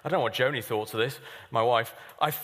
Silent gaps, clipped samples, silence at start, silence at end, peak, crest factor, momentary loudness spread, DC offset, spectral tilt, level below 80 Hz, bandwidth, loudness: none; under 0.1%; 0.05 s; 0 s; -10 dBFS; 18 dB; 7 LU; under 0.1%; -4.5 dB/octave; -72 dBFS; 15.5 kHz; -28 LUFS